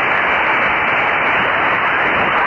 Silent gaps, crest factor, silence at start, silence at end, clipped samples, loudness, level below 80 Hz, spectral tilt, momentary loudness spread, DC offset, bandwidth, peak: none; 10 dB; 0 s; 0 s; under 0.1%; -14 LUFS; -46 dBFS; -5.5 dB/octave; 0 LU; under 0.1%; 7.6 kHz; -6 dBFS